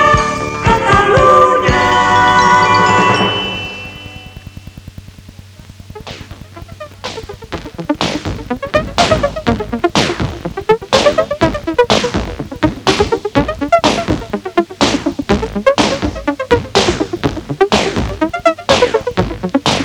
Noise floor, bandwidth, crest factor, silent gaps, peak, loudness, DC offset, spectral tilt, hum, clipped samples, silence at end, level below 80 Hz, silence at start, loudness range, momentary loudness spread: -36 dBFS; 18.5 kHz; 14 dB; none; 0 dBFS; -13 LUFS; under 0.1%; -4.5 dB/octave; none; under 0.1%; 0 s; -30 dBFS; 0 s; 15 LU; 21 LU